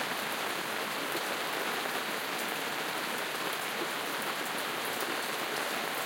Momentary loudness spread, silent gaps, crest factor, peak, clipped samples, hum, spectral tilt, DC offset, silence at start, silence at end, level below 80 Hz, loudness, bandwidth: 1 LU; none; 18 dB; -18 dBFS; under 0.1%; none; -1.5 dB/octave; under 0.1%; 0 s; 0 s; -82 dBFS; -33 LUFS; 17 kHz